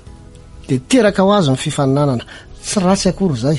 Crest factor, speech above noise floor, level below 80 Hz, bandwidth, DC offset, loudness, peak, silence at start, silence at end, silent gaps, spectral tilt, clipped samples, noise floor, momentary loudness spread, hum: 14 dB; 23 dB; -40 dBFS; 11.5 kHz; under 0.1%; -15 LUFS; -2 dBFS; 0.05 s; 0 s; none; -5.5 dB/octave; under 0.1%; -37 dBFS; 10 LU; none